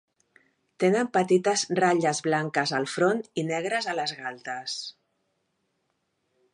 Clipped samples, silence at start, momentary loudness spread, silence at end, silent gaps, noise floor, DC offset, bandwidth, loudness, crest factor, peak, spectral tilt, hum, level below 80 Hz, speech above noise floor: under 0.1%; 0.8 s; 11 LU; 1.65 s; none; -76 dBFS; under 0.1%; 11 kHz; -26 LUFS; 20 dB; -8 dBFS; -4 dB/octave; none; -78 dBFS; 50 dB